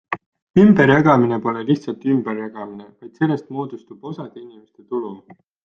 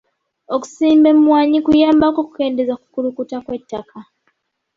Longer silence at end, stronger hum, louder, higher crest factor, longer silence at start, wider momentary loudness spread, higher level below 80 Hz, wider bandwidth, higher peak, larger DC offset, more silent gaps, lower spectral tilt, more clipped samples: second, 0.5 s vs 0.75 s; neither; about the same, -17 LUFS vs -15 LUFS; about the same, 18 dB vs 14 dB; second, 0.1 s vs 0.5 s; first, 21 LU vs 16 LU; about the same, -54 dBFS vs -50 dBFS; second, 6.8 kHz vs 7.6 kHz; about the same, -2 dBFS vs -2 dBFS; neither; first, 0.26-0.32 s, 0.42-0.54 s vs none; first, -8.5 dB/octave vs -5.5 dB/octave; neither